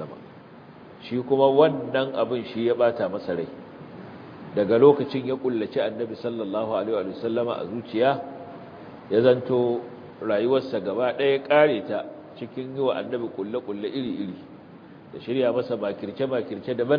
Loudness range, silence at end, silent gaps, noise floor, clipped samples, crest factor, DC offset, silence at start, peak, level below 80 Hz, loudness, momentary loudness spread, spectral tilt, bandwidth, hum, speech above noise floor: 5 LU; 0 s; none; -46 dBFS; under 0.1%; 20 dB; under 0.1%; 0 s; -4 dBFS; -68 dBFS; -24 LUFS; 21 LU; -9 dB/octave; 5.2 kHz; none; 22 dB